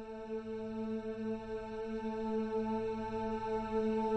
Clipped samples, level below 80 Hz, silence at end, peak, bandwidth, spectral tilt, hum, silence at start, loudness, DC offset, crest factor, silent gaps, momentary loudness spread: under 0.1%; -58 dBFS; 0 s; -24 dBFS; 8.6 kHz; -7.5 dB/octave; none; 0 s; -38 LUFS; under 0.1%; 12 dB; none; 7 LU